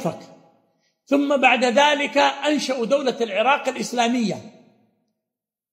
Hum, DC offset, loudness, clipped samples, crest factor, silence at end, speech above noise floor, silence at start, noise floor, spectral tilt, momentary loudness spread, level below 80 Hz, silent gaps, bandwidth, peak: none; under 0.1%; -20 LUFS; under 0.1%; 20 dB; 1.2 s; 67 dB; 0 s; -87 dBFS; -3.5 dB/octave; 9 LU; -74 dBFS; none; 15.5 kHz; -2 dBFS